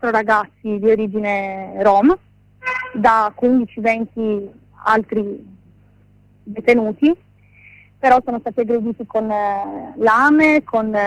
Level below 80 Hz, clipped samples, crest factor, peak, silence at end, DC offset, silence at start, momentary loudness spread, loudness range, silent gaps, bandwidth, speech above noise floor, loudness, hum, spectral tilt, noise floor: -52 dBFS; under 0.1%; 16 dB; -2 dBFS; 0 s; under 0.1%; 0 s; 12 LU; 4 LU; none; 10.5 kHz; 35 dB; -17 LUFS; 50 Hz at -45 dBFS; -6.5 dB/octave; -51 dBFS